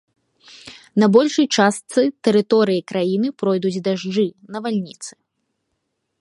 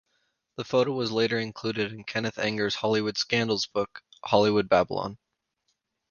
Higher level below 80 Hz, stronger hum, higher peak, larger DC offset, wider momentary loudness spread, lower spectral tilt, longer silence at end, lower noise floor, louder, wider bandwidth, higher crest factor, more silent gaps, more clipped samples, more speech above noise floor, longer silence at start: second, -68 dBFS vs -62 dBFS; neither; first, 0 dBFS vs -6 dBFS; neither; first, 15 LU vs 11 LU; about the same, -5 dB/octave vs -5 dB/octave; first, 1.1 s vs 0.95 s; about the same, -74 dBFS vs -77 dBFS; first, -19 LUFS vs -26 LUFS; first, 11.5 kHz vs 7.2 kHz; about the same, 18 dB vs 22 dB; neither; neither; first, 56 dB vs 51 dB; about the same, 0.65 s vs 0.6 s